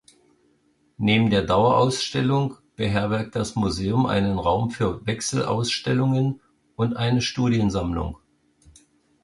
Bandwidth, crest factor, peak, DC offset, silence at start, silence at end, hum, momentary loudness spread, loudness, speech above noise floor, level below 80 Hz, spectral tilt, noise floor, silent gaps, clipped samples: 11.5 kHz; 18 dB; -6 dBFS; under 0.1%; 1 s; 1.1 s; none; 8 LU; -23 LUFS; 42 dB; -44 dBFS; -5.5 dB/octave; -64 dBFS; none; under 0.1%